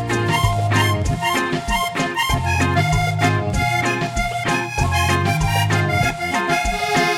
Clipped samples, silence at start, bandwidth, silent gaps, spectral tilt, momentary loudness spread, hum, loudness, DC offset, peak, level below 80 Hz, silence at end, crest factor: under 0.1%; 0 s; 17 kHz; none; -4.5 dB/octave; 3 LU; none; -19 LUFS; under 0.1%; -4 dBFS; -32 dBFS; 0 s; 16 dB